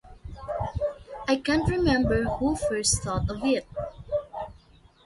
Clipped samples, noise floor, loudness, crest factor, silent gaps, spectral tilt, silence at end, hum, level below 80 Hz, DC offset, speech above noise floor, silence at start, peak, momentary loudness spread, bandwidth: under 0.1%; -55 dBFS; -27 LUFS; 18 dB; none; -4.5 dB/octave; 0.5 s; none; -40 dBFS; under 0.1%; 31 dB; 0.05 s; -10 dBFS; 14 LU; 11.5 kHz